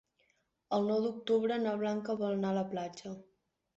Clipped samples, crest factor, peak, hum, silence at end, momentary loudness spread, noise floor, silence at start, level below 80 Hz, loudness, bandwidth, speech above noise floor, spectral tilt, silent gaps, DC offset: under 0.1%; 16 dB; -20 dBFS; none; 0.55 s; 13 LU; -76 dBFS; 0.7 s; -76 dBFS; -34 LUFS; 7.8 kHz; 43 dB; -5.5 dB/octave; none; under 0.1%